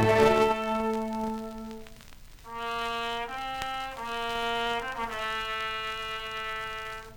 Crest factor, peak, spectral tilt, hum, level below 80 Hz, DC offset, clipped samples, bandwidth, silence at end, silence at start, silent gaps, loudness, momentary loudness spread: 22 dB; -8 dBFS; -4.5 dB/octave; none; -50 dBFS; under 0.1%; under 0.1%; over 20 kHz; 0 s; 0 s; none; -30 LUFS; 13 LU